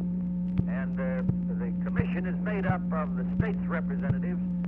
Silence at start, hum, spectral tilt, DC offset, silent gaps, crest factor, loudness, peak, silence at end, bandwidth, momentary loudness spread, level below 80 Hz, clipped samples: 0 s; none; -11.5 dB/octave; under 0.1%; none; 18 dB; -30 LUFS; -12 dBFS; 0 s; 3.4 kHz; 2 LU; -44 dBFS; under 0.1%